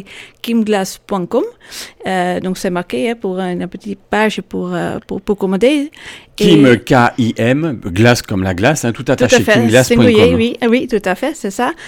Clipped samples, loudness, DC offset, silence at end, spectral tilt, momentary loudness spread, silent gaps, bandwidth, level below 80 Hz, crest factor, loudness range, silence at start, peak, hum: under 0.1%; -14 LUFS; under 0.1%; 0 s; -5.5 dB/octave; 14 LU; none; 17.5 kHz; -42 dBFS; 14 dB; 7 LU; 0 s; 0 dBFS; none